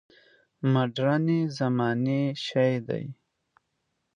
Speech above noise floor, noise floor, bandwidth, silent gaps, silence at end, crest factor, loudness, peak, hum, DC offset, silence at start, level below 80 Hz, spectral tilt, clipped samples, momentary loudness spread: 52 dB; -78 dBFS; 9.4 kHz; none; 1.05 s; 16 dB; -26 LUFS; -10 dBFS; none; under 0.1%; 0.6 s; -72 dBFS; -7.5 dB/octave; under 0.1%; 7 LU